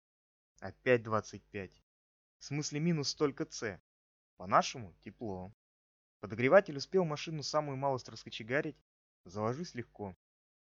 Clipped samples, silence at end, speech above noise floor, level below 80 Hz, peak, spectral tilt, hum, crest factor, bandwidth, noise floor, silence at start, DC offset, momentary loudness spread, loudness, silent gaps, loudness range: under 0.1%; 0.55 s; over 55 dB; -72 dBFS; -10 dBFS; -4.5 dB/octave; none; 26 dB; 7.6 kHz; under -90 dBFS; 0.6 s; under 0.1%; 18 LU; -34 LUFS; 1.83-2.40 s, 3.80-4.37 s, 5.54-6.20 s, 8.81-9.24 s; 5 LU